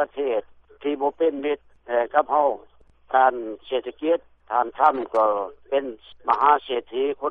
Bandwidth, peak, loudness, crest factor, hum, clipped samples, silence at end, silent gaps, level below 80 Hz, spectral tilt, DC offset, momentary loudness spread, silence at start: 5.6 kHz; -4 dBFS; -23 LUFS; 20 dB; none; under 0.1%; 0 s; none; -62 dBFS; -1 dB/octave; under 0.1%; 9 LU; 0 s